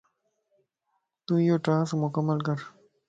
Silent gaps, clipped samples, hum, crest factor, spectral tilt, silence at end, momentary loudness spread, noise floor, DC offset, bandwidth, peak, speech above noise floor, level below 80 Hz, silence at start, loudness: none; under 0.1%; none; 16 dB; -8 dB/octave; 0.4 s; 15 LU; -78 dBFS; under 0.1%; 7.8 kHz; -14 dBFS; 53 dB; -72 dBFS; 1.3 s; -27 LUFS